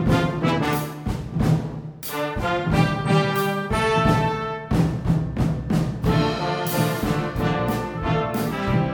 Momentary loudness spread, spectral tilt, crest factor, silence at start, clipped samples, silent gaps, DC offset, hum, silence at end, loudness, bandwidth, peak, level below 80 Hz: 6 LU; -6.5 dB/octave; 18 dB; 0 s; under 0.1%; none; under 0.1%; none; 0 s; -23 LUFS; over 20 kHz; -4 dBFS; -36 dBFS